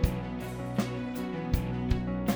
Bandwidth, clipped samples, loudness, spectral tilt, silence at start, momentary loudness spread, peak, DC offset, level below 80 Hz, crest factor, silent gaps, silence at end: over 20 kHz; under 0.1%; -33 LUFS; -7 dB/octave; 0 s; 5 LU; -12 dBFS; under 0.1%; -36 dBFS; 20 dB; none; 0 s